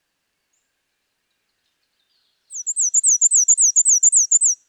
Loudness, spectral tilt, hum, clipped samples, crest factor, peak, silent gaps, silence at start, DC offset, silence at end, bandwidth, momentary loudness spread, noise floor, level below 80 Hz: -13 LUFS; 8 dB/octave; none; under 0.1%; 14 dB; -6 dBFS; none; 2.5 s; under 0.1%; 0.15 s; 17 kHz; 12 LU; -73 dBFS; under -90 dBFS